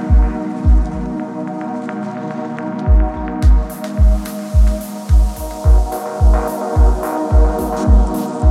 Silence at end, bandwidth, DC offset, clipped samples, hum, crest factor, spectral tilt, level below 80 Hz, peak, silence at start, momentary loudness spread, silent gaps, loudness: 0 s; 14 kHz; under 0.1%; under 0.1%; none; 12 dB; -8 dB/octave; -14 dBFS; 0 dBFS; 0 s; 9 LU; none; -17 LUFS